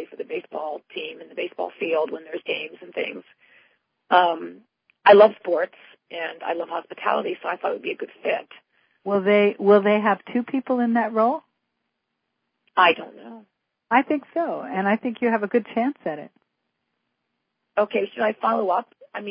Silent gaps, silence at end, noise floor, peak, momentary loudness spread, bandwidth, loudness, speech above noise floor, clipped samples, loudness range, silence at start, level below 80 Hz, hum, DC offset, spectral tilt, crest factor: none; 0 s; -78 dBFS; -2 dBFS; 15 LU; 5.2 kHz; -22 LUFS; 56 dB; under 0.1%; 8 LU; 0 s; -78 dBFS; none; under 0.1%; -9.5 dB/octave; 22 dB